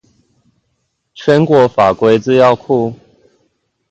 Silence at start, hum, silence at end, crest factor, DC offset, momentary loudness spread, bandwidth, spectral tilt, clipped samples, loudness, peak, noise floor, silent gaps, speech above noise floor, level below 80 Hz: 1.2 s; none; 0.95 s; 14 dB; under 0.1%; 7 LU; 8.2 kHz; -7 dB/octave; under 0.1%; -12 LUFS; 0 dBFS; -67 dBFS; none; 56 dB; -50 dBFS